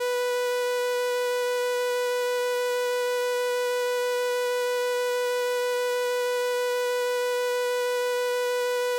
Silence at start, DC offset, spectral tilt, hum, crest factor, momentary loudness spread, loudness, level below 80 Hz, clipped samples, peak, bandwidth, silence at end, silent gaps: 0 s; under 0.1%; 2 dB/octave; 50 Hz at -75 dBFS; 8 dB; 0 LU; -26 LUFS; -78 dBFS; under 0.1%; -18 dBFS; 17 kHz; 0 s; none